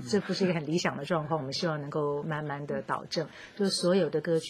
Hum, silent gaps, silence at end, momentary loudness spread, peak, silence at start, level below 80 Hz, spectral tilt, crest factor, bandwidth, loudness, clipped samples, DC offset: none; none; 0 s; 8 LU; -12 dBFS; 0 s; -68 dBFS; -5 dB/octave; 18 dB; 14.5 kHz; -30 LUFS; under 0.1%; under 0.1%